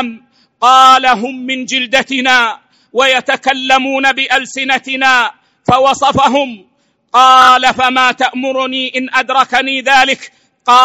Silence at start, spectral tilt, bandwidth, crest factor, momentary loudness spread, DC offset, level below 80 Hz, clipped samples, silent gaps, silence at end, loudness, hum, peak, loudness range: 0 s; -2.5 dB/octave; 16 kHz; 12 dB; 11 LU; 0.1%; -48 dBFS; 1%; none; 0 s; -10 LUFS; none; 0 dBFS; 2 LU